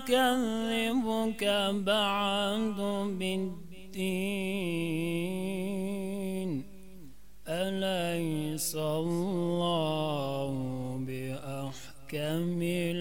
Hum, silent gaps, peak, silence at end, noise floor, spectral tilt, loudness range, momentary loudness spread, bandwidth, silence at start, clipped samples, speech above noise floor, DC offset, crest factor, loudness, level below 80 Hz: none; none; -14 dBFS; 0 s; -54 dBFS; -5 dB/octave; 5 LU; 10 LU; 16.5 kHz; 0 s; under 0.1%; 24 dB; 0.6%; 18 dB; -32 LUFS; -60 dBFS